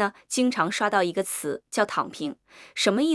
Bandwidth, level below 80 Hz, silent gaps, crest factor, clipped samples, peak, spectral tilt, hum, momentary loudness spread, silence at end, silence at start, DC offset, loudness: 12 kHz; -76 dBFS; none; 18 dB; under 0.1%; -8 dBFS; -3.5 dB/octave; none; 11 LU; 0 s; 0 s; under 0.1%; -26 LUFS